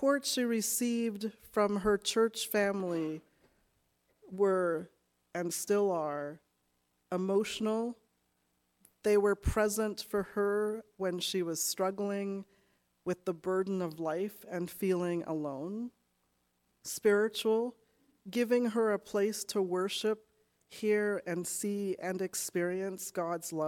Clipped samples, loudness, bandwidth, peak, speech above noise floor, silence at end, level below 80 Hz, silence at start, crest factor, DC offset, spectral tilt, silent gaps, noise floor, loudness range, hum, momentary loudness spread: under 0.1%; -33 LUFS; 18 kHz; -16 dBFS; 45 dB; 0 s; -56 dBFS; 0 s; 18 dB; under 0.1%; -4 dB/octave; none; -77 dBFS; 4 LU; none; 10 LU